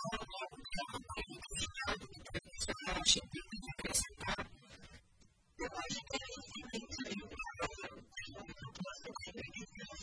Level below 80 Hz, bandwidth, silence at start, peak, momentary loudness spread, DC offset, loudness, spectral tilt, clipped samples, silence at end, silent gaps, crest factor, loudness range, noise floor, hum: -56 dBFS; 11 kHz; 0 s; -16 dBFS; 14 LU; under 0.1%; -41 LUFS; -2 dB/octave; under 0.1%; 0 s; none; 28 dB; 8 LU; -69 dBFS; none